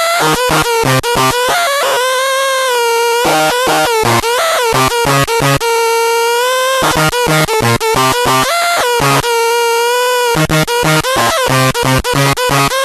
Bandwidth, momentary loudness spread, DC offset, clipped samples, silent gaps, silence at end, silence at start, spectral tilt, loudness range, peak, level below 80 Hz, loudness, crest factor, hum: 14 kHz; 1 LU; under 0.1%; under 0.1%; none; 0 s; 0 s; -3.5 dB/octave; 0 LU; 0 dBFS; -34 dBFS; -11 LUFS; 12 dB; none